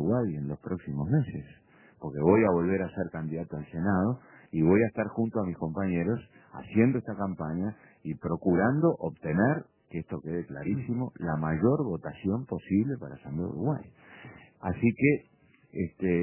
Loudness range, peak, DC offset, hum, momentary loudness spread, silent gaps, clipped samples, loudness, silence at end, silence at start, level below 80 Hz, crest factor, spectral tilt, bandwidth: 3 LU; -8 dBFS; under 0.1%; none; 14 LU; none; under 0.1%; -29 LUFS; 0 s; 0 s; -52 dBFS; 20 dB; -9.5 dB/octave; 3.2 kHz